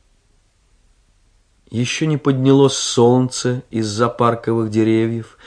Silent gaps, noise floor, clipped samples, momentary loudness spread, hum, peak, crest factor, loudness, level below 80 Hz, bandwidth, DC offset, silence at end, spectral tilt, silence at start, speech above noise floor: none; -58 dBFS; under 0.1%; 9 LU; none; 0 dBFS; 18 dB; -17 LUFS; -56 dBFS; 10.5 kHz; under 0.1%; 0.25 s; -5.5 dB/octave; 1.7 s; 41 dB